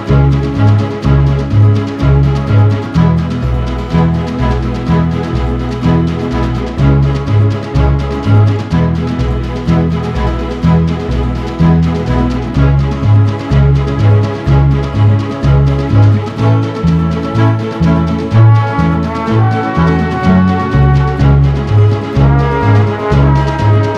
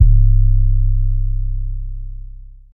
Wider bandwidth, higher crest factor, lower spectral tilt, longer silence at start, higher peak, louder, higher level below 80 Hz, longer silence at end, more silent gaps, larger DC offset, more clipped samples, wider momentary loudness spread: first, 7.2 kHz vs 0.3 kHz; about the same, 10 dB vs 14 dB; second, -8.5 dB/octave vs -14.5 dB/octave; about the same, 0 s vs 0 s; about the same, 0 dBFS vs 0 dBFS; first, -11 LUFS vs -18 LUFS; second, -20 dBFS vs -14 dBFS; about the same, 0 s vs 0.05 s; neither; neither; neither; second, 5 LU vs 20 LU